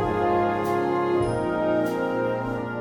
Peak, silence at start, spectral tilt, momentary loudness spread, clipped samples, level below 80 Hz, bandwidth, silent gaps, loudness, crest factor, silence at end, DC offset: -12 dBFS; 0 s; -7.5 dB/octave; 4 LU; under 0.1%; -48 dBFS; 16.5 kHz; none; -24 LUFS; 12 dB; 0 s; under 0.1%